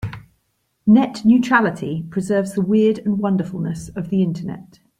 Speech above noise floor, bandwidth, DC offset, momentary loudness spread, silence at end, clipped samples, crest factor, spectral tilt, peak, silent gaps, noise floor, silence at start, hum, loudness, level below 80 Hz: 51 dB; 11.5 kHz; under 0.1%; 14 LU; 0.35 s; under 0.1%; 16 dB; -7.5 dB/octave; -2 dBFS; none; -69 dBFS; 0 s; none; -19 LUFS; -52 dBFS